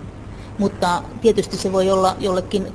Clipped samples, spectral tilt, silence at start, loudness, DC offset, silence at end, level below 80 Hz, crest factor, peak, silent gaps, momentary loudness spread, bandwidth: under 0.1%; -5.5 dB/octave; 0 s; -19 LUFS; under 0.1%; 0 s; -40 dBFS; 16 dB; -4 dBFS; none; 13 LU; 11 kHz